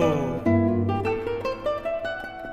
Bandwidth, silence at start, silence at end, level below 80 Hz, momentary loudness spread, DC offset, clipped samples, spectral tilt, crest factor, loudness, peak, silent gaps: 12.5 kHz; 0 s; 0 s; -46 dBFS; 8 LU; under 0.1%; under 0.1%; -8 dB/octave; 16 dB; -26 LUFS; -8 dBFS; none